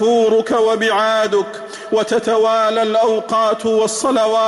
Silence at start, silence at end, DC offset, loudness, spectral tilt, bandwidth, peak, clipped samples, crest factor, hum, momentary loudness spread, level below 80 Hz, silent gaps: 0 s; 0 s; under 0.1%; -15 LUFS; -3 dB/octave; 12 kHz; -6 dBFS; under 0.1%; 8 dB; none; 5 LU; -60 dBFS; none